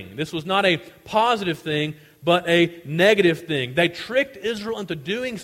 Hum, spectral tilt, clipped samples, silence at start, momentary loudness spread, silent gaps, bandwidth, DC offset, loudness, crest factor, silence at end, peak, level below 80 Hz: none; -5 dB/octave; under 0.1%; 0 s; 11 LU; none; 16 kHz; under 0.1%; -22 LUFS; 18 dB; 0 s; -4 dBFS; -58 dBFS